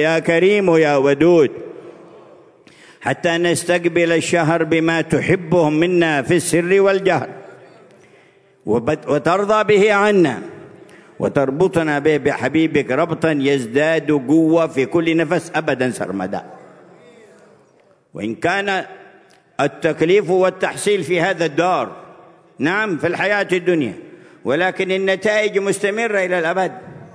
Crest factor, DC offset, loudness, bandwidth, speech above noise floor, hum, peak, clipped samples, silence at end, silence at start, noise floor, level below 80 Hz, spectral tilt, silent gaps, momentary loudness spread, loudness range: 16 dB; under 0.1%; -17 LUFS; 11 kHz; 38 dB; none; -2 dBFS; under 0.1%; 0.05 s; 0 s; -54 dBFS; -58 dBFS; -5.5 dB/octave; none; 11 LU; 5 LU